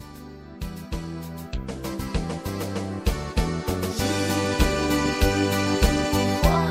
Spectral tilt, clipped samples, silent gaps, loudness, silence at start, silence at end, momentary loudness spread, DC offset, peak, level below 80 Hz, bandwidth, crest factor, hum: -5 dB/octave; under 0.1%; none; -25 LUFS; 0 s; 0 s; 14 LU; under 0.1%; -4 dBFS; -30 dBFS; 16.5 kHz; 20 dB; none